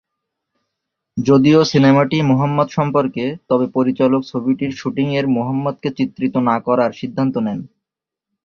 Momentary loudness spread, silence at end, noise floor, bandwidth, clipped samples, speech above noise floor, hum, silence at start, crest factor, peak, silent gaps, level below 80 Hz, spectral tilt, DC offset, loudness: 10 LU; 0.8 s; -84 dBFS; 6.8 kHz; under 0.1%; 68 dB; none; 1.15 s; 16 dB; -2 dBFS; none; -54 dBFS; -7.5 dB/octave; under 0.1%; -17 LUFS